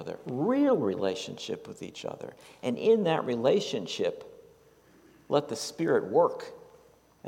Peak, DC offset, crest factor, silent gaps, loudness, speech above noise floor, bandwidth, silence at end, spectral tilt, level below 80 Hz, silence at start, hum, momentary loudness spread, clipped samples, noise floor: -10 dBFS; under 0.1%; 20 dB; none; -29 LUFS; 31 dB; 16 kHz; 0 s; -5.5 dB/octave; -74 dBFS; 0 s; none; 16 LU; under 0.1%; -59 dBFS